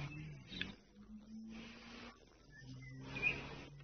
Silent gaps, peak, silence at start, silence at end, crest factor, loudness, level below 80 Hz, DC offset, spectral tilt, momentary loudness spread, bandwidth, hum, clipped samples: none; -22 dBFS; 0 s; 0 s; 26 dB; -46 LUFS; -64 dBFS; under 0.1%; -3 dB/octave; 21 LU; 6.4 kHz; none; under 0.1%